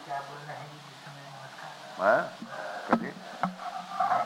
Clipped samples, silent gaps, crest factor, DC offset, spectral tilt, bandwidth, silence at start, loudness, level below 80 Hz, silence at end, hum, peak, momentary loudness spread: under 0.1%; none; 22 dB; under 0.1%; -5 dB/octave; 16 kHz; 0 s; -32 LUFS; -78 dBFS; 0 s; none; -10 dBFS; 19 LU